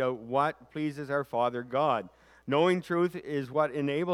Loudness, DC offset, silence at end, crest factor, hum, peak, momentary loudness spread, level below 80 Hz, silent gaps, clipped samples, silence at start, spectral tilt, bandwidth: -30 LUFS; under 0.1%; 0 s; 16 dB; none; -12 dBFS; 8 LU; -70 dBFS; none; under 0.1%; 0 s; -7 dB/octave; 14 kHz